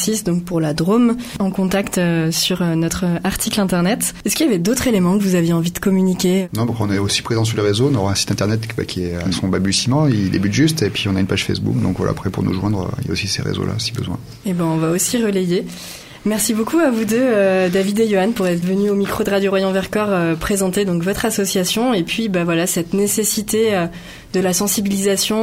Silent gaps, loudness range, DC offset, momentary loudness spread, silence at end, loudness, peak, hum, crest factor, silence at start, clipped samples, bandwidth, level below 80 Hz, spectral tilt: none; 3 LU; under 0.1%; 5 LU; 0 s; -18 LUFS; -2 dBFS; none; 14 dB; 0 s; under 0.1%; 16.5 kHz; -42 dBFS; -5 dB/octave